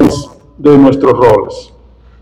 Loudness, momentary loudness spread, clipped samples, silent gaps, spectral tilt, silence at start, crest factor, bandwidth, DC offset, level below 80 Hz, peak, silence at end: -8 LUFS; 17 LU; 5%; none; -7.5 dB/octave; 0 s; 10 dB; 11.5 kHz; under 0.1%; -36 dBFS; 0 dBFS; 0.6 s